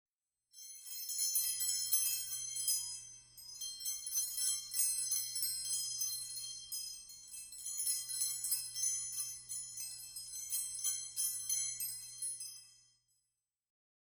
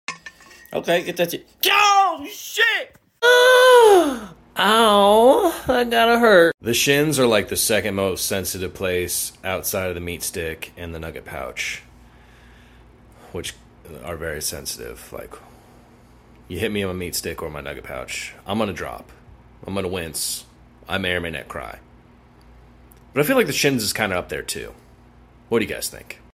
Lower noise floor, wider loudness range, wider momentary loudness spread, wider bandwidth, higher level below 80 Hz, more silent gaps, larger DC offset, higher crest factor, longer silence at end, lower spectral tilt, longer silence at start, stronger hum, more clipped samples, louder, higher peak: first, -88 dBFS vs -50 dBFS; second, 3 LU vs 17 LU; second, 14 LU vs 20 LU; first, over 20 kHz vs 16.5 kHz; second, -78 dBFS vs -48 dBFS; second, none vs 6.54-6.58 s; neither; about the same, 22 dB vs 20 dB; first, 1.25 s vs 0.2 s; second, 3.5 dB/octave vs -3 dB/octave; first, 0.55 s vs 0.1 s; neither; neither; second, -36 LUFS vs -19 LUFS; second, -18 dBFS vs -2 dBFS